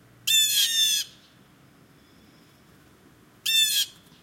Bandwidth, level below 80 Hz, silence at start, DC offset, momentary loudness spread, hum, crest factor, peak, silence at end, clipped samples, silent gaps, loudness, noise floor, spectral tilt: 16.5 kHz; -70 dBFS; 0.25 s; under 0.1%; 12 LU; none; 18 dB; -10 dBFS; 0.3 s; under 0.1%; none; -21 LUFS; -55 dBFS; 3 dB/octave